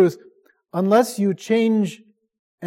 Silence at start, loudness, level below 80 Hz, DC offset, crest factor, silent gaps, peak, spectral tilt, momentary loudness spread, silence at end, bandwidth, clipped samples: 0 s; -20 LUFS; -74 dBFS; under 0.1%; 16 dB; 2.39-2.58 s; -4 dBFS; -6.5 dB/octave; 9 LU; 0 s; 16.5 kHz; under 0.1%